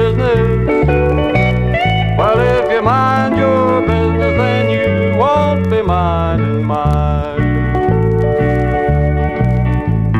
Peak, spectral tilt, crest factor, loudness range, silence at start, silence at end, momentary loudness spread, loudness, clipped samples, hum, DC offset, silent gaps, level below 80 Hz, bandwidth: 0 dBFS; -8.5 dB/octave; 12 dB; 2 LU; 0 s; 0 s; 3 LU; -13 LUFS; under 0.1%; none; 0.2%; none; -22 dBFS; 8.4 kHz